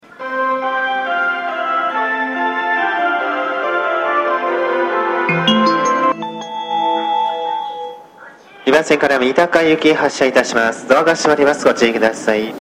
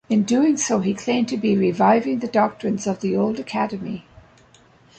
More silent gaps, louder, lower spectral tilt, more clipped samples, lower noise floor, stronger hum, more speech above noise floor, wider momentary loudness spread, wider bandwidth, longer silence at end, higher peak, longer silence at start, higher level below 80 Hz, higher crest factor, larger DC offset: neither; first, -15 LUFS vs -21 LUFS; second, -4 dB/octave vs -5.5 dB/octave; neither; second, -40 dBFS vs -53 dBFS; neither; second, 26 dB vs 33 dB; about the same, 7 LU vs 7 LU; first, 15.5 kHz vs 9.2 kHz; second, 0 s vs 1 s; first, 0 dBFS vs -6 dBFS; about the same, 0.1 s vs 0.1 s; about the same, -56 dBFS vs -60 dBFS; about the same, 16 dB vs 16 dB; neither